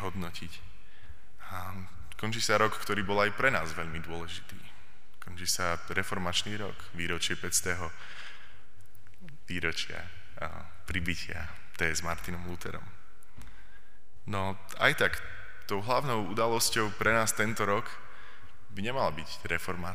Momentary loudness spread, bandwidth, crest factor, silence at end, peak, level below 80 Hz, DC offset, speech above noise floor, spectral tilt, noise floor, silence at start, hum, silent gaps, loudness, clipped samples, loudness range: 20 LU; 15.5 kHz; 26 dB; 0 s; -8 dBFS; -54 dBFS; 2%; 28 dB; -3 dB/octave; -60 dBFS; 0 s; none; none; -31 LUFS; under 0.1%; 8 LU